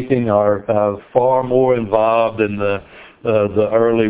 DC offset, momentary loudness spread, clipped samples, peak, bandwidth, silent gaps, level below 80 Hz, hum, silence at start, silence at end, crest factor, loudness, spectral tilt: under 0.1%; 5 LU; under 0.1%; 0 dBFS; 4 kHz; none; -48 dBFS; none; 0 s; 0 s; 14 dB; -16 LUFS; -11 dB/octave